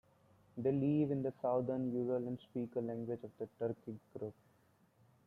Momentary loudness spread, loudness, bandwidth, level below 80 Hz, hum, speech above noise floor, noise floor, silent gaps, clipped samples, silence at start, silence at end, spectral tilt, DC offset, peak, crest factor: 14 LU; -39 LUFS; 4.1 kHz; -76 dBFS; none; 33 dB; -72 dBFS; none; under 0.1%; 0.55 s; 0.95 s; -10.5 dB/octave; under 0.1%; -24 dBFS; 16 dB